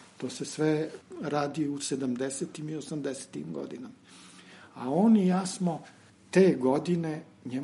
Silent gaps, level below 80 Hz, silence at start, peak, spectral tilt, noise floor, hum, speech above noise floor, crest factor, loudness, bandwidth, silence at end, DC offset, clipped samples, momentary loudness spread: none; -76 dBFS; 0 s; -10 dBFS; -6 dB/octave; -52 dBFS; none; 23 dB; 20 dB; -29 LUFS; 11.5 kHz; 0 s; under 0.1%; under 0.1%; 17 LU